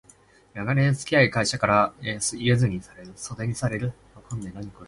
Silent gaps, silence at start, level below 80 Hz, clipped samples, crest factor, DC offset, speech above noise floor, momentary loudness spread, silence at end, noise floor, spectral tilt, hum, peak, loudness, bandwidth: none; 0.55 s; -52 dBFS; under 0.1%; 20 dB; under 0.1%; 31 dB; 17 LU; 0 s; -56 dBFS; -5 dB/octave; none; -4 dBFS; -24 LUFS; 11.5 kHz